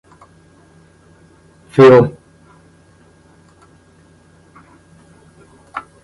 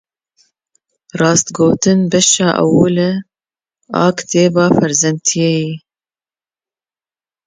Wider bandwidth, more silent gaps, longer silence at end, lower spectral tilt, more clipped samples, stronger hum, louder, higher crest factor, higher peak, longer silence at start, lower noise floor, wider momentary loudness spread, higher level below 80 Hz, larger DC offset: first, 11 kHz vs 9.6 kHz; neither; second, 0.25 s vs 1.7 s; first, -8 dB/octave vs -4.5 dB/octave; neither; neither; first, -10 LUFS vs -13 LUFS; about the same, 18 dB vs 16 dB; about the same, 0 dBFS vs 0 dBFS; first, 1.75 s vs 1.15 s; second, -49 dBFS vs under -90 dBFS; first, 24 LU vs 9 LU; about the same, -52 dBFS vs -52 dBFS; neither